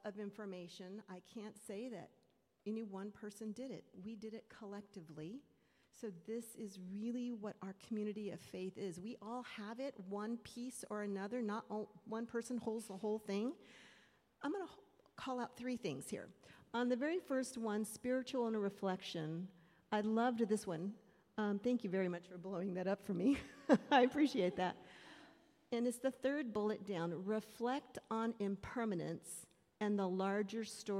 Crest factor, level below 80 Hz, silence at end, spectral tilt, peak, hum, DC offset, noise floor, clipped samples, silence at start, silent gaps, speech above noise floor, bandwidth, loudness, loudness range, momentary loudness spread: 24 dB; -78 dBFS; 0 s; -5.5 dB/octave; -18 dBFS; none; under 0.1%; -70 dBFS; under 0.1%; 0.05 s; none; 29 dB; 15.5 kHz; -42 LUFS; 12 LU; 15 LU